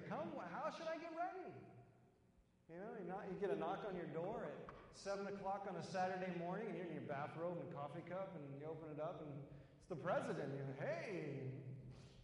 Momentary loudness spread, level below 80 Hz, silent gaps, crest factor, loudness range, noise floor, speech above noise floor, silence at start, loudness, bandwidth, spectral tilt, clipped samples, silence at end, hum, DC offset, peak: 12 LU; -78 dBFS; none; 18 dB; 3 LU; -74 dBFS; 27 dB; 0 s; -48 LUFS; 11 kHz; -6.5 dB/octave; under 0.1%; 0 s; none; under 0.1%; -30 dBFS